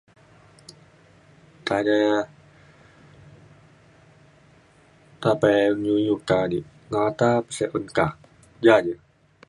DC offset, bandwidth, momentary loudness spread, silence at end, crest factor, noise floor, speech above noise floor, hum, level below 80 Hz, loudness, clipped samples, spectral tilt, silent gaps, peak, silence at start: under 0.1%; 11 kHz; 11 LU; 0.55 s; 22 dB; -55 dBFS; 34 dB; none; -58 dBFS; -22 LUFS; under 0.1%; -6 dB/octave; none; -2 dBFS; 1.65 s